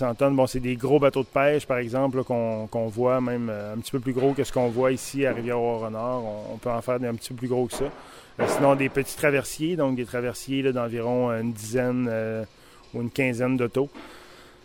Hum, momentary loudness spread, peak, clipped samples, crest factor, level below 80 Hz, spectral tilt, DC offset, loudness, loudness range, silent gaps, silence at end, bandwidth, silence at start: none; 10 LU; -6 dBFS; under 0.1%; 18 dB; -50 dBFS; -6 dB/octave; under 0.1%; -25 LUFS; 3 LU; none; 0.15 s; 17 kHz; 0 s